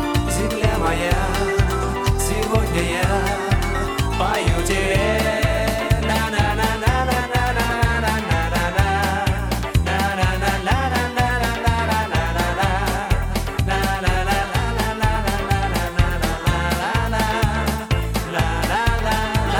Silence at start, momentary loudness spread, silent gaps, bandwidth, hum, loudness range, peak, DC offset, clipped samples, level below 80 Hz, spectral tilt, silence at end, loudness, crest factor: 0 s; 3 LU; none; 19 kHz; none; 1 LU; -4 dBFS; under 0.1%; under 0.1%; -26 dBFS; -5 dB/octave; 0 s; -20 LUFS; 16 dB